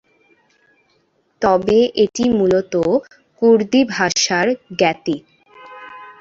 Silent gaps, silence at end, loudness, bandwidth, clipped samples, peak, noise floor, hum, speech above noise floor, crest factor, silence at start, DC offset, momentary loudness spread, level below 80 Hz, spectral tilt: none; 0.1 s; -16 LUFS; 7.8 kHz; under 0.1%; -2 dBFS; -62 dBFS; none; 46 dB; 16 dB; 1.4 s; under 0.1%; 12 LU; -52 dBFS; -4 dB/octave